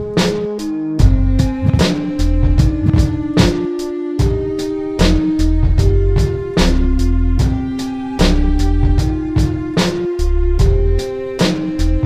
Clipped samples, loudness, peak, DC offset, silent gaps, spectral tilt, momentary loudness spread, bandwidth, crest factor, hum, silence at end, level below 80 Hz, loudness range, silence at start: under 0.1%; -16 LUFS; 0 dBFS; under 0.1%; none; -6.5 dB/octave; 6 LU; 14 kHz; 14 dB; none; 0 s; -16 dBFS; 2 LU; 0 s